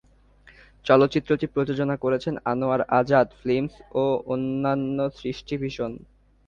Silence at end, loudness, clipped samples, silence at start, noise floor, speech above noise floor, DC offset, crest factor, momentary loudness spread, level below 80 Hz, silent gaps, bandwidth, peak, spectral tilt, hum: 0.5 s; -24 LUFS; under 0.1%; 0.85 s; -55 dBFS; 31 dB; under 0.1%; 22 dB; 11 LU; -54 dBFS; none; 7.2 kHz; -4 dBFS; -7.5 dB/octave; none